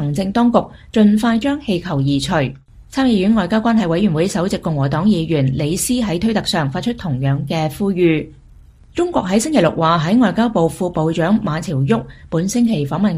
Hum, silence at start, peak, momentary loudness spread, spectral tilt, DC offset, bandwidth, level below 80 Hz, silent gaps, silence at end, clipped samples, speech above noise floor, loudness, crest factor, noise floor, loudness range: none; 0 s; 0 dBFS; 7 LU; -6 dB/octave; under 0.1%; 15 kHz; -42 dBFS; none; 0 s; under 0.1%; 27 dB; -17 LUFS; 16 dB; -43 dBFS; 2 LU